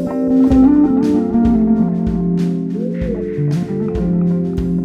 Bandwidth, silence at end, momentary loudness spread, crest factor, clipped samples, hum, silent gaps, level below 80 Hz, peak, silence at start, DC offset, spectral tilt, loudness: 7.2 kHz; 0 s; 10 LU; 12 dB; under 0.1%; none; none; -30 dBFS; -2 dBFS; 0 s; under 0.1%; -10 dB/octave; -15 LUFS